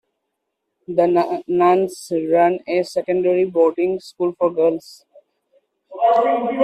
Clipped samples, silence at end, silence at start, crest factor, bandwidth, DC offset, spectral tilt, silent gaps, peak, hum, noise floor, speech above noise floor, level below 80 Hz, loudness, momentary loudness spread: under 0.1%; 0 s; 0.9 s; 16 dB; 13 kHz; under 0.1%; -6.5 dB/octave; none; -4 dBFS; none; -76 dBFS; 59 dB; -66 dBFS; -18 LUFS; 7 LU